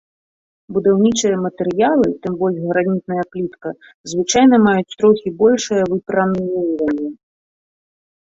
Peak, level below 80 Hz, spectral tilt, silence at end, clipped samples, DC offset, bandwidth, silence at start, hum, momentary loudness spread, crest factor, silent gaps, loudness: -2 dBFS; -54 dBFS; -5 dB/octave; 1.15 s; under 0.1%; under 0.1%; 8 kHz; 0.7 s; none; 12 LU; 16 dB; 3.94-4.04 s; -17 LUFS